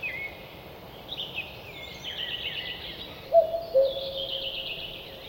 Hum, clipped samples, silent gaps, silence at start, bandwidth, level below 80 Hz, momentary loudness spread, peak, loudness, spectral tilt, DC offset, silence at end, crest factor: none; under 0.1%; none; 0 s; 16.5 kHz; -56 dBFS; 17 LU; -10 dBFS; -30 LUFS; -4 dB/octave; under 0.1%; 0 s; 20 dB